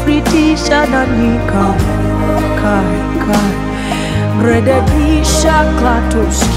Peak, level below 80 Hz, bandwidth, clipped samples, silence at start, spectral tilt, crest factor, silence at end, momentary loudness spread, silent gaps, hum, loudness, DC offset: 0 dBFS; -20 dBFS; 16 kHz; under 0.1%; 0 s; -5.5 dB/octave; 10 dB; 0 s; 5 LU; none; none; -12 LUFS; under 0.1%